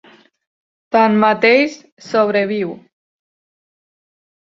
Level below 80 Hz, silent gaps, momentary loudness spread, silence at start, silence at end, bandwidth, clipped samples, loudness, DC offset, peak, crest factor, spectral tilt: -66 dBFS; 1.92-1.97 s; 9 LU; 0.95 s; 1.65 s; 7.6 kHz; under 0.1%; -15 LUFS; under 0.1%; 0 dBFS; 18 dB; -6 dB/octave